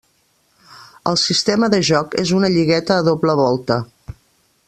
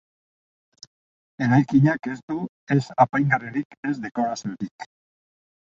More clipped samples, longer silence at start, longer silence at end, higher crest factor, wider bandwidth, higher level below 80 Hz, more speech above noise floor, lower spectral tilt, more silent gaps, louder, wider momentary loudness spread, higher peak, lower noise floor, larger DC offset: neither; second, 0.75 s vs 1.4 s; second, 0.55 s vs 0.75 s; about the same, 18 dB vs 20 dB; first, 12.5 kHz vs 7.6 kHz; first, -50 dBFS vs -62 dBFS; second, 45 dB vs over 68 dB; second, -4.5 dB/octave vs -7.5 dB/octave; second, none vs 2.23-2.28 s, 2.49-2.67 s, 3.65-3.70 s, 3.77-3.83 s, 4.71-4.79 s; first, -16 LUFS vs -23 LUFS; second, 6 LU vs 14 LU; first, 0 dBFS vs -4 dBFS; second, -61 dBFS vs under -90 dBFS; neither